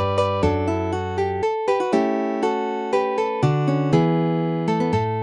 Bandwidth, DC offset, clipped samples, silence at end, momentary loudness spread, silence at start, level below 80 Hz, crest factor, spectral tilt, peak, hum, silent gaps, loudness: 10.5 kHz; under 0.1%; under 0.1%; 0 s; 4 LU; 0 s; -46 dBFS; 16 dB; -7.5 dB/octave; -6 dBFS; none; none; -21 LUFS